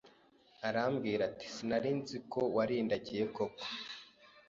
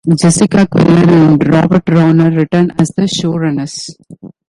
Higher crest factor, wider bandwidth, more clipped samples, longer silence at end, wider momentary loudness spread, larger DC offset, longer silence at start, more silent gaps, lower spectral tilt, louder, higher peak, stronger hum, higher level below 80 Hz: first, 18 dB vs 10 dB; second, 7.6 kHz vs 11.5 kHz; neither; about the same, 0.1 s vs 0.2 s; about the same, 9 LU vs 10 LU; neither; about the same, 0.05 s vs 0.05 s; neither; second, -4 dB/octave vs -6.5 dB/octave; second, -37 LUFS vs -10 LUFS; second, -18 dBFS vs 0 dBFS; neither; second, -72 dBFS vs -42 dBFS